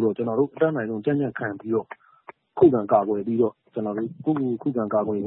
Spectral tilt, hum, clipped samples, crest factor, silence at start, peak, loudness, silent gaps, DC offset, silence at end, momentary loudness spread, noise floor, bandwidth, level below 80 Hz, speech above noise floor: -12.5 dB/octave; none; under 0.1%; 18 dB; 0 s; -4 dBFS; -24 LUFS; none; under 0.1%; 0 s; 11 LU; -49 dBFS; 4 kHz; -64 dBFS; 26 dB